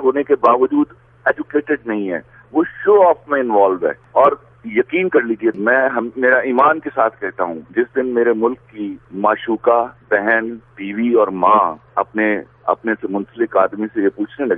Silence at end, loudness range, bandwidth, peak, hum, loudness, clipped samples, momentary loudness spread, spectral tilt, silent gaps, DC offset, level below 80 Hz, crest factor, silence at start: 0 s; 2 LU; 3.8 kHz; 0 dBFS; none; -17 LUFS; under 0.1%; 9 LU; -9 dB/octave; none; under 0.1%; -58 dBFS; 16 dB; 0 s